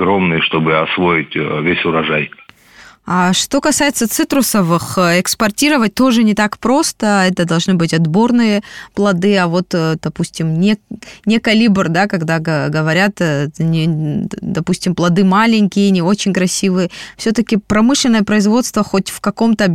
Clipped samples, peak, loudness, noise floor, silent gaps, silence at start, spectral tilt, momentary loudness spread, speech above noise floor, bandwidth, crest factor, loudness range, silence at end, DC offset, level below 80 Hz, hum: under 0.1%; -2 dBFS; -14 LUFS; -42 dBFS; none; 0 s; -5 dB/octave; 7 LU; 29 dB; 18 kHz; 12 dB; 2 LU; 0 s; under 0.1%; -46 dBFS; none